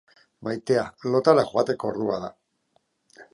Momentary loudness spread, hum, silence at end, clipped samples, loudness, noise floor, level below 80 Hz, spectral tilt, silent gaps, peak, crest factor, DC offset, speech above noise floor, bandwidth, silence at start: 13 LU; none; 0.1 s; under 0.1%; -24 LUFS; -69 dBFS; -64 dBFS; -6.5 dB/octave; none; -2 dBFS; 22 dB; under 0.1%; 46 dB; 11.5 kHz; 0.4 s